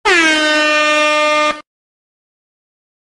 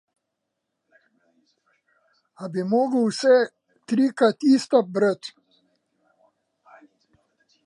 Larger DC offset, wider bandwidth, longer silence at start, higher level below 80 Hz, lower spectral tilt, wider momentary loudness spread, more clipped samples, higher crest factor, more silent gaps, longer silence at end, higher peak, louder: neither; first, 12.5 kHz vs 11 kHz; second, 0.05 s vs 2.4 s; first, -52 dBFS vs -80 dBFS; second, -0.5 dB/octave vs -5.5 dB/octave; second, 6 LU vs 13 LU; neither; second, 14 dB vs 20 dB; neither; second, 1.4 s vs 2.35 s; first, 0 dBFS vs -6 dBFS; first, -11 LUFS vs -21 LUFS